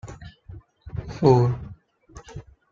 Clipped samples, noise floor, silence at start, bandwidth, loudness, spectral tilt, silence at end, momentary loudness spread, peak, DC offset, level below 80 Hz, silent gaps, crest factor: under 0.1%; -48 dBFS; 0.05 s; 7.6 kHz; -21 LUFS; -8.5 dB/octave; 0.3 s; 26 LU; -4 dBFS; under 0.1%; -46 dBFS; none; 22 dB